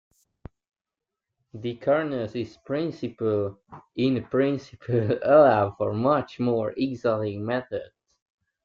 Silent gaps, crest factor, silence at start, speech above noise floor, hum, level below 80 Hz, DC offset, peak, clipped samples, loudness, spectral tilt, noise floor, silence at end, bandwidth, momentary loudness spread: none; 20 dB; 1.55 s; 64 dB; none; -62 dBFS; under 0.1%; -6 dBFS; under 0.1%; -25 LUFS; -8.5 dB/octave; -88 dBFS; 0.8 s; 7.2 kHz; 14 LU